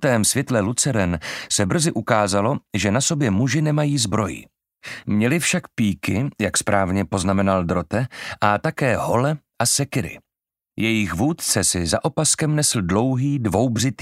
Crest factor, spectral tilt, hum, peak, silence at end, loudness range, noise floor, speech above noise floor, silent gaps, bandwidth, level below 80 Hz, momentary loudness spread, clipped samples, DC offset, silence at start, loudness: 20 dB; -4.5 dB/octave; none; 0 dBFS; 0 s; 2 LU; -88 dBFS; 68 dB; none; 16 kHz; -48 dBFS; 6 LU; under 0.1%; under 0.1%; 0 s; -20 LUFS